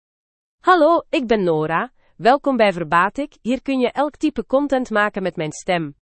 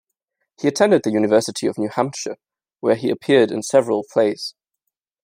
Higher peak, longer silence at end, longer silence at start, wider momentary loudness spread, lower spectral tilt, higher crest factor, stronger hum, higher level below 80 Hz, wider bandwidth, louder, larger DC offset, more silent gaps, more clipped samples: about the same, -2 dBFS vs -2 dBFS; second, 0.2 s vs 0.75 s; about the same, 0.65 s vs 0.6 s; second, 9 LU vs 13 LU; about the same, -5.5 dB/octave vs -5 dB/octave; about the same, 18 dB vs 18 dB; neither; first, -52 dBFS vs -68 dBFS; second, 8.8 kHz vs 16 kHz; about the same, -19 LUFS vs -19 LUFS; neither; neither; neither